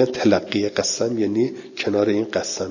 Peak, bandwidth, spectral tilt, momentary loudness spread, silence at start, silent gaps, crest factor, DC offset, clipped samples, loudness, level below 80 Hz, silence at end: -4 dBFS; 7.4 kHz; -4 dB/octave; 5 LU; 0 s; none; 18 dB; under 0.1%; under 0.1%; -21 LUFS; -54 dBFS; 0 s